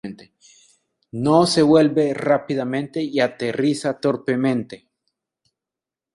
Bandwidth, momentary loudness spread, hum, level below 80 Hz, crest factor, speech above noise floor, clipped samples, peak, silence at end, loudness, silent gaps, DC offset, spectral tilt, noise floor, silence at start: 11.5 kHz; 10 LU; none; -62 dBFS; 18 dB; 69 dB; under 0.1%; -2 dBFS; 1.4 s; -19 LUFS; none; under 0.1%; -6 dB/octave; -88 dBFS; 0.05 s